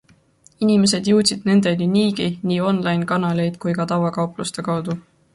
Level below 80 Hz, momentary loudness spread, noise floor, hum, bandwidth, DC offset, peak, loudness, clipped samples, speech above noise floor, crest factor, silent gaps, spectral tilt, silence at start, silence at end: -58 dBFS; 8 LU; -54 dBFS; none; 11.5 kHz; under 0.1%; -4 dBFS; -19 LUFS; under 0.1%; 35 dB; 16 dB; none; -5.5 dB/octave; 0.6 s; 0.35 s